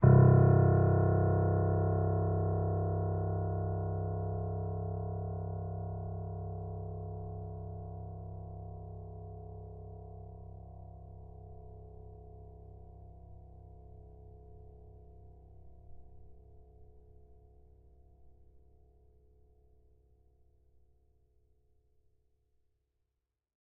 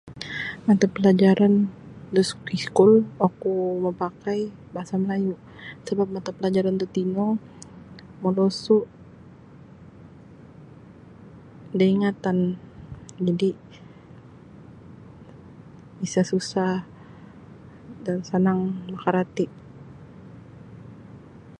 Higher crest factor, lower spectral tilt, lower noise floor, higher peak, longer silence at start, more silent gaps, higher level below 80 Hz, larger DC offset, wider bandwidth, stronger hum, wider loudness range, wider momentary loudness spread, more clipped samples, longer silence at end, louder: about the same, 24 dB vs 22 dB; first, -9 dB/octave vs -7 dB/octave; first, -87 dBFS vs -47 dBFS; second, -12 dBFS vs -4 dBFS; about the same, 0 s vs 0.05 s; neither; first, -52 dBFS vs -58 dBFS; neither; second, 2 kHz vs 10.5 kHz; neither; first, 25 LU vs 10 LU; about the same, 27 LU vs 26 LU; neither; first, 5.3 s vs 0.05 s; second, -32 LUFS vs -23 LUFS